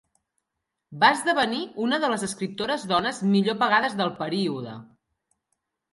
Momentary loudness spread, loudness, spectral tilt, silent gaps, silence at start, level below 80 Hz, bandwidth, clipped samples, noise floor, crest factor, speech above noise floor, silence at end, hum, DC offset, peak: 9 LU; -24 LUFS; -4.5 dB/octave; none; 0.9 s; -68 dBFS; 11.5 kHz; under 0.1%; -83 dBFS; 20 dB; 59 dB; 1.1 s; none; under 0.1%; -4 dBFS